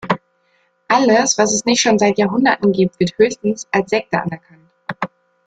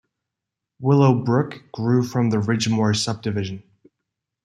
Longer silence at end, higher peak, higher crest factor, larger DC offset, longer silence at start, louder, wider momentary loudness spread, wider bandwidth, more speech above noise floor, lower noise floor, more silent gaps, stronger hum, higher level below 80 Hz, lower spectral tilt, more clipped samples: second, 0.4 s vs 0.85 s; about the same, -2 dBFS vs -2 dBFS; about the same, 16 dB vs 20 dB; neither; second, 0.05 s vs 0.8 s; first, -16 LUFS vs -21 LUFS; first, 14 LU vs 11 LU; second, 9.4 kHz vs 12.5 kHz; second, 46 dB vs 64 dB; second, -61 dBFS vs -84 dBFS; neither; neither; about the same, -56 dBFS vs -60 dBFS; second, -4 dB/octave vs -6 dB/octave; neither